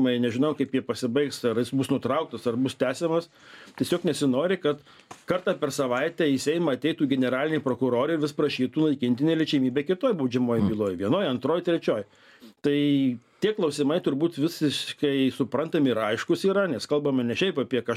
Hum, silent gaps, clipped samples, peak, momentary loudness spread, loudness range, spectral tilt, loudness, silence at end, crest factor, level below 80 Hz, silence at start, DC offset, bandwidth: none; none; under 0.1%; -10 dBFS; 4 LU; 2 LU; -6 dB/octave; -26 LUFS; 0 s; 16 dB; -66 dBFS; 0 s; under 0.1%; 15 kHz